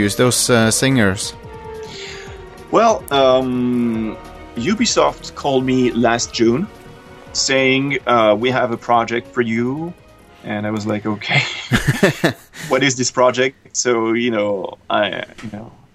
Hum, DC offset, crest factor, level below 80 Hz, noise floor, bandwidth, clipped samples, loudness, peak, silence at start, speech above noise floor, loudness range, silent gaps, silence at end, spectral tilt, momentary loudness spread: none; under 0.1%; 18 dB; -44 dBFS; -39 dBFS; 15 kHz; under 0.1%; -17 LUFS; 0 dBFS; 0 s; 22 dB; 3 LU; none; 0.25 s; -4 dB/octave; 17 LU